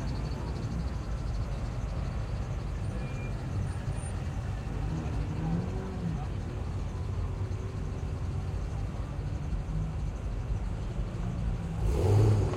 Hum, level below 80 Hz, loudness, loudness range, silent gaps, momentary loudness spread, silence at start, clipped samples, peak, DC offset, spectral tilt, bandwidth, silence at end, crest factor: none; -36 dBFS; -34 LUFS; 1 LU; none; 4 LU; 0 s; under 0.1%; -14 dBFS; under 0.1%; -7.5 dB/octave; 11 kHz; 0 s; 18 dB